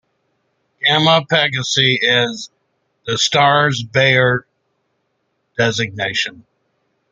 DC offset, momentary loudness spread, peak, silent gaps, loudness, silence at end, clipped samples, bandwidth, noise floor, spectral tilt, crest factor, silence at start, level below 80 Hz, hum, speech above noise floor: under 0.1%; 11 LU; 0 dBFS; none; -15 LUFS; 0.7 s; under 0.1%; 9.4 kHz; -69 dBFS; -3.5 dB/octave; 18 dB; 0.8 s; -56 dBFS; none; 53 dB